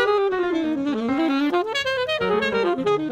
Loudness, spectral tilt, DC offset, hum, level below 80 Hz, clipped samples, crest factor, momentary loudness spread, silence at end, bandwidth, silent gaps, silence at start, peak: -22 LUFS; -5 dB/octave; under 0.1%; none; -56 dBFS; under 0.1%; 14 dB; 3 LU; 0 s; 14 kHz; none; 0 s; -8 dBFS